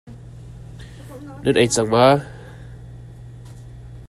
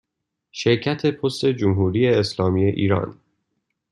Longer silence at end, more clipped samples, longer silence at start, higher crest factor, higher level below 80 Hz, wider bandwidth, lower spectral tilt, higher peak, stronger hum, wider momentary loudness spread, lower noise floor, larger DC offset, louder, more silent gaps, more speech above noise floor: second, 0.05 s vs 0.8 s; neither; second, 0.05 s vs 0.55 s; first, 22 dB vs 16 dB; first, -44 dBFS vs -58 dBFS; first, 14 kHz vs 11 kHz; second, -4.5 dB/octave vs -6.5 dB/octave; first, 0 dBFS vs -4 dBFS; neither; first, 25 LU vs 6 LU; second, -38 dBFS vs -80 dBFS; neither; first, -17 LUFS vs -21 LUFS; neither; second, 21 dB vs 61 dB